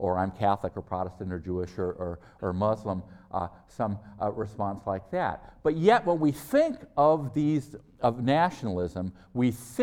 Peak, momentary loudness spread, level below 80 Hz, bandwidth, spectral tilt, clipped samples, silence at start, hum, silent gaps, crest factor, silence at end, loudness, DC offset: -8 dBFS; 11 LU; -56 dBFS; 17.5 kHz; -7 dB/octave; under 0.1%; 0 s; none; none; 20 dB; 0 s; -29 LUFS; under 0.1%